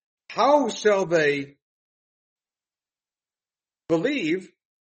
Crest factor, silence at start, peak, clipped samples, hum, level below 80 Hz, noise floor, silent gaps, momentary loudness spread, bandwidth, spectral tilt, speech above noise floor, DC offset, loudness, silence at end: 20 dB; 0.3 s; -6 dBFS; under 0.1%; none; -72 dBFS; under -90 dBFS; 1.62-2.36 s; 10 LU; 8.4 kHz; -4.5 dB/octave; over 68 dB; under 0.1%; -23 LUFS; 0.45 s